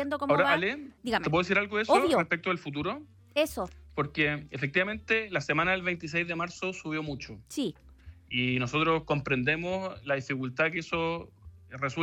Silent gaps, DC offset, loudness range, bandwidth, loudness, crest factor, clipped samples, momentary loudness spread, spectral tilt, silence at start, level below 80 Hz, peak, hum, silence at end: none; under 0.1%; 4 LU; 16 kHz; -29 LUFS; 20 dB; under 0.1%; 10 LU; -5.5 dB/octave; 0 s; -56 dBFS; -10 dBFS; none; 0 s